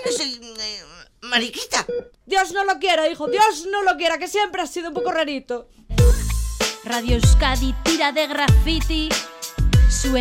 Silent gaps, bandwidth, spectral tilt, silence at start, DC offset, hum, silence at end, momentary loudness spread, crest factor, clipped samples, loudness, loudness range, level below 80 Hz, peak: none; 16.5 kHz; -4 dB/octave; 0 s; under 0.1%; none; 0 s; 11 LU; 16 dB; under 0.1%; -20 LUFS; 3 LU; -24 dBFS; -4 dBFS